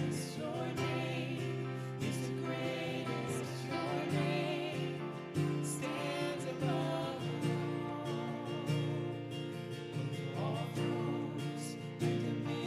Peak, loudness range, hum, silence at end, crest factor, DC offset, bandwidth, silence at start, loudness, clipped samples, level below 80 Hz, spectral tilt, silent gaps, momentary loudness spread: -22 dBFS; 2 LU; none; 0 s; 16 dB; under 0.1%; 15 kHz; 0 s; -38 LUFS; under 0.1%; -72 dBFS; -6 dB/octave; none; 5 LU